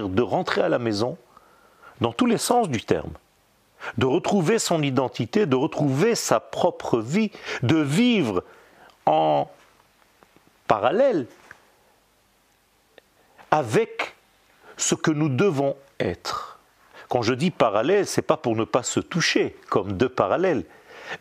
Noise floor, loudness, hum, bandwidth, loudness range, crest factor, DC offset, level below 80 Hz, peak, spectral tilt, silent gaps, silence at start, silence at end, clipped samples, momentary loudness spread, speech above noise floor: -62 dBFS; -23 LUFS; none; 15.5 kHz; 5 LU; 22 dB; under 0.1%; -60 dBFS; -2 dBFS; -5 dB/octave; none; 0 s; 0.05 s; under 0.1%; 10 LU; 40 dB